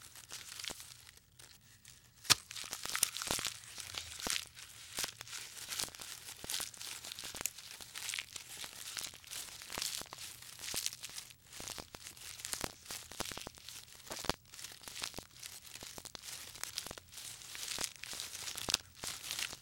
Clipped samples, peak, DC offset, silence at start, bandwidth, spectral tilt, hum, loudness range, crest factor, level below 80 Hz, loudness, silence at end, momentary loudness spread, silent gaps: under 0.1%; -6 dBFS; under 0.1%; 0 s; over 20 kHz; 0 dB/octave; none; 8 LU; 36 dB; -66 dBFS; -41 LUFS; 0 s; 13 LU; none